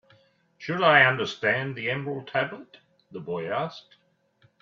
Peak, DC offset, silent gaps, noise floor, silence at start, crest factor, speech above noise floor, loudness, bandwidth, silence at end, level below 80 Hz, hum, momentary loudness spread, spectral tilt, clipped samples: -6 dBFS; under 0.1%; none; -64 dBFS; 0.6 s; 22 dB; 39 dB; -24 LUFS; 7.4 kHz; 0.8 s; -70 dBFS; none; 22 LU; -5.5 dB/octave; under 0.1%